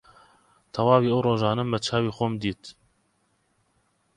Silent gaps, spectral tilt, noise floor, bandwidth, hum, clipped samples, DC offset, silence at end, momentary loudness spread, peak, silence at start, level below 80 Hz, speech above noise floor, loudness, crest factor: none; -6.5 dB/octave; -70 dBFS; 11 kHz; none; under 0.1%; under 0.1%; 1.45 s; 15 LU; -4 dBFS; 0.75 s; -58 dBFS; 46 dB; -24 LUFS; 22 dB